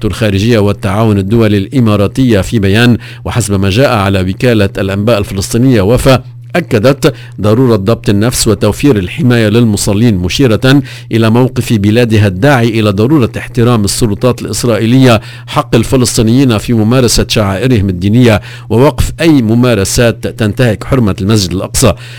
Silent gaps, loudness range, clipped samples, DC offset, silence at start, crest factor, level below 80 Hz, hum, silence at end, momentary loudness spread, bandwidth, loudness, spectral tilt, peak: none; 1 LU; 1%; 0.7%; 0 s; 8 dB; -26 dBFS; none; 0 s; 5 LU; 16 kHz; -9 LUFS; -5.5 dB/octave; 0 dBFS